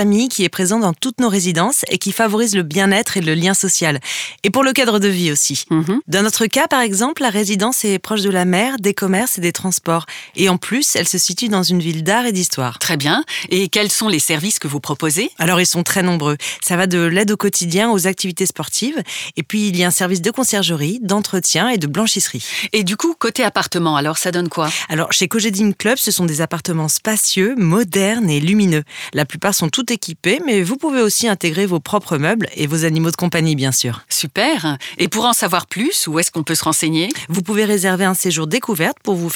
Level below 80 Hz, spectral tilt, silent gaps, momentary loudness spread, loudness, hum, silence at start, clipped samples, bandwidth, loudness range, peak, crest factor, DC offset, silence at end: -62 dBFS; -3.5 dB/octave; none; 5 LU; -16 LUFS; none; 0 s; under 0.1%; 20 kHz; 2 LU; 0 dBFS; 16 dB; under 0.1%; 0 s